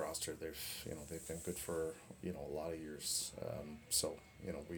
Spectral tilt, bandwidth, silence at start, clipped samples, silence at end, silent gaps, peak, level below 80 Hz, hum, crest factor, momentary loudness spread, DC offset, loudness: -3 dB/octave; over 20 kHz; 0 s; under 0.1%; 0 s; none; -22 dBFS; -64 dBFS; none; 22 dB; 11 LU; under 0.1%; -43 LUFS